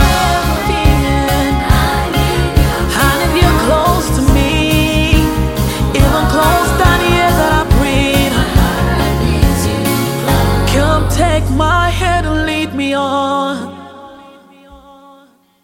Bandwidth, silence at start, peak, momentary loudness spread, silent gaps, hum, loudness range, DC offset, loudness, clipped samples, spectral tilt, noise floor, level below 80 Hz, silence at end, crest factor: 17 kHz; 0 s; 0 dBFS; 4 LU; none; none; 4 LU; under 0.1%; -13 LUFS; under 0.1%; -5 dB/octave; -47 dBFS; -18 dBFS; 0.9 s; 12 dB